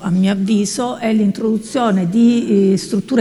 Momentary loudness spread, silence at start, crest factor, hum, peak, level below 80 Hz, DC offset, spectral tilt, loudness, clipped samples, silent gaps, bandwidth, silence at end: 5 LU; 0 s; 14 dB; none; 0 dBFS; -56 dBFS; under 0.1%; -6 dB/octave; -16 LUFS; under 0.1%; none; 12 kHz; 0 s